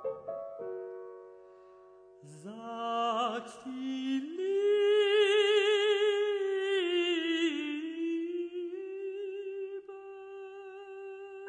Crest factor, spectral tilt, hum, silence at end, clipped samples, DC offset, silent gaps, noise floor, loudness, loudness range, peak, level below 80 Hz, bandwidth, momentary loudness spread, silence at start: 16 dB; -3 dB/octave; none; 0 s; under 0.1%; under 0.1%; none; -56 dBFS; -31 LUFS; 11 LU; -16 dBFS; -84 dBFS; 10 kHz; 20 LU; 0 s